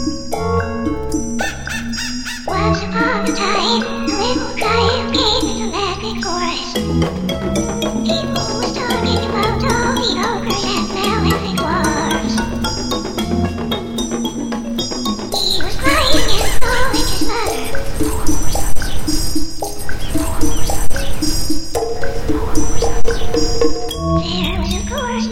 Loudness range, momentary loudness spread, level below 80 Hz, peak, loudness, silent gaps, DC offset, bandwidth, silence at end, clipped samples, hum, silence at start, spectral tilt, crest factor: 4 LU; 6 LU; -26 dBFS; 0 dBFS; -18 LUFS; none; under 0.1%; 16 kHz; 0 s; under 0.1%; none; 0 s; -4 dB/octave; 14 dB